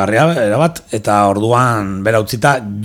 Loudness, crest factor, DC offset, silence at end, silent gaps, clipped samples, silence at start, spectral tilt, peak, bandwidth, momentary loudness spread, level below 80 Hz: -14 LUFS; 14 dB; under 0.1%; 0 s; none; under 0.1%; 0 s; -6 dB/octave; 0 dBFS; 17.5 kHz; 4 LU; -48 dBFS